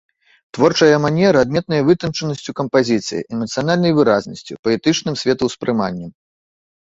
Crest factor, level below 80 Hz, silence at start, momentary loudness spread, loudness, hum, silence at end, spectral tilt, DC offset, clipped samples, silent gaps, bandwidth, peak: 16 dB; -52 dBFS; 0.55 s; 11 LU; -17 LUFS; none; 0.7 s; -5.5 dB/octave; under 0.1%; under 0.1%; 4.59-4.63 s; 8 kHz; -2 dBFS